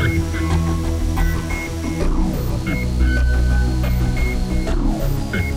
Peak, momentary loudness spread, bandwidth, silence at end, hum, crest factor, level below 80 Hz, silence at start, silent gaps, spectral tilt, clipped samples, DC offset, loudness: -6 dBFS; 4 LU; 15.5 kHz; 0 s; none; 12 dB; -20 dBFS; 0 s; none; -6.5 dB/octave; under 0.1%; under 0.1%; -21 LUFS